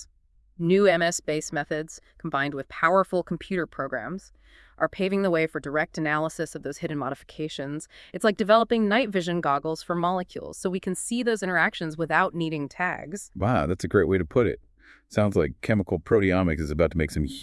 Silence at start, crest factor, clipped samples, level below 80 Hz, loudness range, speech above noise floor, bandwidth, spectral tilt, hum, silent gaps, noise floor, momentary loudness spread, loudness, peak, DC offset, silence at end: 0 s; 20 dB; under 0.1%; -48 dBFS; 3 LU; 35 dB; 12 kHz; -5.5 dB/octave; none; none; -61 dBFS; 11 LU; -25 LUFS; -6 dBFS; under 0.1%; 0 s